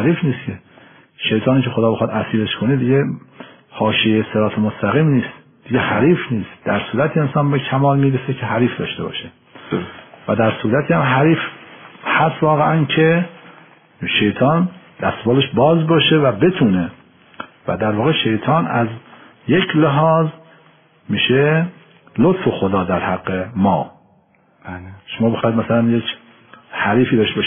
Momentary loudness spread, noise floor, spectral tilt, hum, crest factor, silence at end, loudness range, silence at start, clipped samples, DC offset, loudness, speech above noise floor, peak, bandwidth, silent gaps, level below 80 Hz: 14 LU; -55 dBFS; -5 dB/octave; none; 14 dB; 0 s; 4 LU; 0 s; under 0.1%; under 0.1%; -17 LUFS; 39 dB; -2 dBFS; 3.6 kHz; none; -54 dBFS